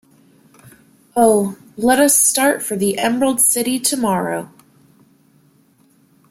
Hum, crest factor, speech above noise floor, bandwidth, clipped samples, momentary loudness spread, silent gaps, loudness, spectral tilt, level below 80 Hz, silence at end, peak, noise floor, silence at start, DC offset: none; 18 dB; 39 dB; 16.5 kHz; under 0.1%; 11 LU; none; -15 LUFS; -3 dB/octave; -58 dBFS; 1.85 s; -2 dBFS; -55 dBFS; 0.65 s; under 0.1%